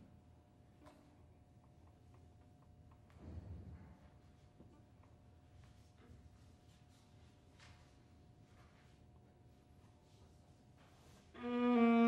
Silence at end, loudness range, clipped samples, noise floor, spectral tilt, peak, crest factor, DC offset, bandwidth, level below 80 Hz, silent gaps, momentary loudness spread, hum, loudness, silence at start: 0 s; 10 LU; under 0.1%; -66 dBFS; -7.5 dB/octave; -24 dBFS; 22 dB; under 0.1%; 7.4 kHz; -68 dBFS; none; 14 LU; none; -39 LUFS; 0.85 s